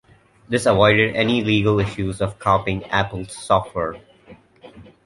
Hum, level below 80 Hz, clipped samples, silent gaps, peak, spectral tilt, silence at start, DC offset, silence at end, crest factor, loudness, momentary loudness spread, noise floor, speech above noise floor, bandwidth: none; -44 dBFS; under 0.1%; none; -2 dBFS; -5.5 dB/octave; 0.5 s; under 0.1%; 0.25 s; 20 dB; -19 LUFS; 12 LU; -48 dBFS; 29 dB; 11.5 kHz